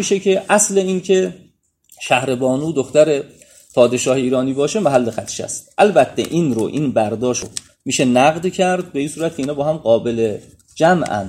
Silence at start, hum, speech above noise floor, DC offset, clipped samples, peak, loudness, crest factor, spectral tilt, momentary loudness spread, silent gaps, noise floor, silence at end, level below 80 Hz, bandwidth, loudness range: 0 s; none; 36 dB; under 0.1%; under 0.1%; 0 dBFS; -17 LUFS; 16 dB; -4.5 dB/octave; 10 LU; none; -52 dBFS; 0 s; -54 dBFS; 15.5 kHz; 1 LU